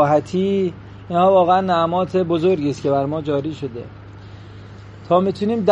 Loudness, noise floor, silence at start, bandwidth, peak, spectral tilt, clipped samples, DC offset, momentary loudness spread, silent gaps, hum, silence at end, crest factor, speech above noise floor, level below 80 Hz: -18 LUFS; -38 dBFS; 0 s; 8.4 kHz; -2 dBFS; -7.5 dB/octave; under 0.1%; under 0.1%; 24 LU; none; none; 0 s; 18 dB; 20 dB; -50 dBFS